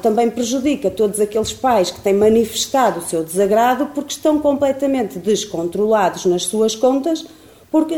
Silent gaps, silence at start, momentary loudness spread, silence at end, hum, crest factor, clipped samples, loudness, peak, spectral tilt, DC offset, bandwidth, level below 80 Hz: none; 0 s; 6 LU; 0 s; none; 14 dB; under 0.1%; -17 LUFS; -4 dBFS; -4 dB/octave; 0.1%; 18 kHz; -50 dBFS